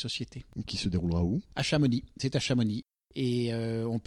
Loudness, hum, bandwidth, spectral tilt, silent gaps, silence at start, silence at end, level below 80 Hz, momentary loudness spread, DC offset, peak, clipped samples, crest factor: -31 LUFS; none; 12 kHz; -6 dB/octave; none; 0 s; 0.05 s; -50 dBFS; 10 LU; under 0.1%; -16 dBFS; under 0.1%; 16 dB